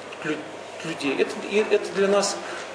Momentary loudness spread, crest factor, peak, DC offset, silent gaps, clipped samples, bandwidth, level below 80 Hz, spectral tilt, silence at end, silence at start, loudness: 11 LU; 18 dB; -8 dBFS; under 0.1%; none; under 0.1%; 10.5 kHz; -74 dBFS; -3.5 dB/octave; 0 s; 0 s; -25 LUFS